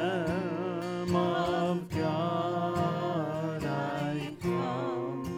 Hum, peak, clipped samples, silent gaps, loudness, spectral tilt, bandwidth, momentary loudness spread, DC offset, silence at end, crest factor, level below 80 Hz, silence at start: none; -16 dBFS; under 0.1%; none; -31 LUFS; -7 dB/octave; 15.5 kHz; 5 LU; under 0.1%; 0 s; 14 dB; -58 dBFS; 0 s